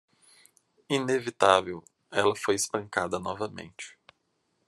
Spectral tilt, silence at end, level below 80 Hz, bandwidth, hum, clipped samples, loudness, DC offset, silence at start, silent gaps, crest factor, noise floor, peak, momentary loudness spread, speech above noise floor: -3.5 dB/octave; 0.8 s; -76 dBFS; 13 kHz; none; under 0.1%; -27 LUFS; under 0.1%; 0.9 s; none; 24 dB; -75 dBFS; -4 dBFS; 20 LU; 48 dB